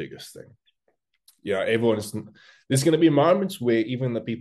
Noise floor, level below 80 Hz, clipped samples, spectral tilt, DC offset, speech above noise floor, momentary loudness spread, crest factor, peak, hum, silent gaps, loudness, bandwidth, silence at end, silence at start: -73 dBFS; -66 dBFS; under 0.1%; -6 dB/octave; under 0.1%; 49 dB; 19 LU; 18 dB; -8 dBFS; none; none; -22 LUFS; 12.5 kHz; 0 s; 0 s